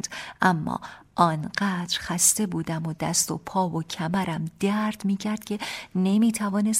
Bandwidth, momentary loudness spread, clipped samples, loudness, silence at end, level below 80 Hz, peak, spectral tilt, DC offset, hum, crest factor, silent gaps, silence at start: 16 kHz; 10 LU; under 0.1%; -25 LUFS; 0 s; -58 dBFS; -6 dBFS; -4 dB/octave; under 0.1%; none; 20 dB; none; 0.05 s